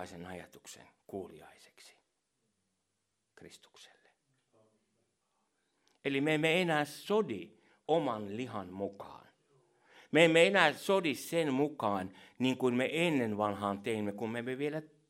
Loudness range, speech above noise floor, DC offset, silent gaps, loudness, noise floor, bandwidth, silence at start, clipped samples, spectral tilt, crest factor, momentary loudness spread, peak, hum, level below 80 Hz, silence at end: 21 LU; 50 dB; under 0.1%; none; -32 LUFS; -83 dBFS; 16 kHz; 0 s; under 0.1%; -5 dB/octave; 24 dB; 20 LU; -10 dBFS; none; -80 dBFS; 0.25 s